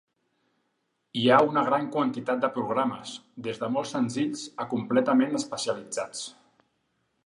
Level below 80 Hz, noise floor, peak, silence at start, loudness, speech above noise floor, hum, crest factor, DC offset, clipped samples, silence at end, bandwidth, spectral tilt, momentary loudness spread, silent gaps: -74 dBFS; -76 dBFS; -6 dBFS; 1.15 s; -27 LUFS; 50 dB; none; 22 dB; under 0.1%; under 0.1%; 0.95 s; 11 kHz; -4.5 dB/octave; 15 LU; none